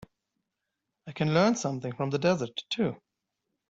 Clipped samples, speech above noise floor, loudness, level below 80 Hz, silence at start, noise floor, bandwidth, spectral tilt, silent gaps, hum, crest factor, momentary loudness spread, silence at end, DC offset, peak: under 0.1%; 57 dB; -28 LUFS; -68 dBFS; 1.05 s; -85 dBFS; 8 kHz; -5.5 dB/octave; none; none; 20 dB; 9 LU; 0.75 s; under 0.1%; -10 dBFS